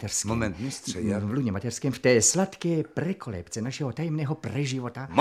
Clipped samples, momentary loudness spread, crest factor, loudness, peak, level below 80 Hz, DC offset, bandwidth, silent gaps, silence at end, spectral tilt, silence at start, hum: under 0.1%; 12 LU; 22 dB; -27 LUFS; -6 dBFS; -54 dBFS; under 0.1%; 15 kHz; none; 0 s; -4.5 dB/octave; 0 s; none